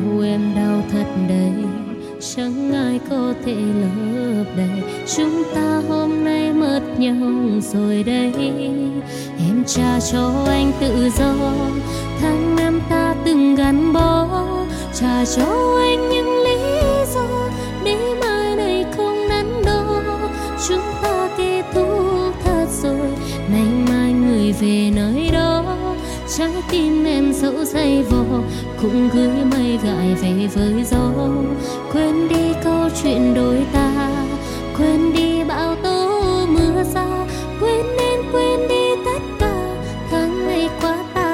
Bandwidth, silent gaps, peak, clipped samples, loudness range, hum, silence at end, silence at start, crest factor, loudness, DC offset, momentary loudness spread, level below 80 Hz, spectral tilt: 16.5 kHz; none; -2 dBFS; under 0.1%; 3 LU; none; 0 s; 0 s; 16 dB; -18 LUFS; under 0.1%; 7 LU; -32 dBFS; -5.5 dB/octave